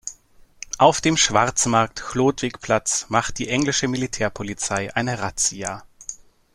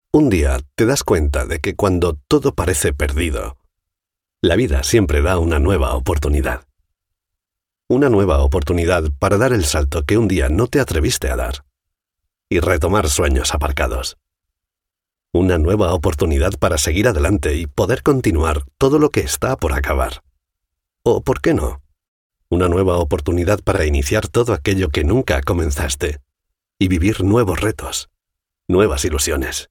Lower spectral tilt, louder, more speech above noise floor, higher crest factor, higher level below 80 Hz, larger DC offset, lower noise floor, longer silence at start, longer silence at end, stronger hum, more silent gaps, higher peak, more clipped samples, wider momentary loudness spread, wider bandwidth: second, -3 dB/octave vs -5.5 dB/octave; second, -21 LUFS vs -17 LUFS; second, 30 dB vs 69 dB; first, 22 dB vs 16 dB; second, -48 dBFS vs -24 dBFS; neither; second, -51 dBFS vs -85 dBFS; about the same, 0.05 s vs 0.15 s; first, 0.4 s vs 0.05 s; neither; second, none vs 22.08-22.30 s; about the same, -2 dBFS vs 0 dBFS; neither; first, 17 LU vs 6 LU; second, 14 kHz vs 17.5 kHz